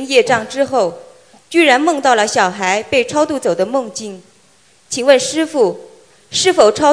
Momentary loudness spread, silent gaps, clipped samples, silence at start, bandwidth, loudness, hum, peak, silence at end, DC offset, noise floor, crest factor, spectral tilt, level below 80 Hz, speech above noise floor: 10 LU; none; under 0.1%; 0 s; 10.5 kHz; -14 LUFS; none; 0 dBFS; 0 s; 0.1%; -51 dBFS; 14 dB; -2.5 dB/octave; -56 dBFS; 38 dB